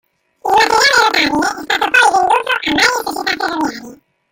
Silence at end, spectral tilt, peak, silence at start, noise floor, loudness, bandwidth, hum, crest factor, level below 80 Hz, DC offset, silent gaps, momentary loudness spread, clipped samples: 0.35 s; -1.5 dB/octave; 0 dBFS; 0.45 s; -37 dBFS; -13 LUFS; 17 kHz; none; 14 dB; -50 dBFS; under 0.1%; none; 10 LU; under 0.1%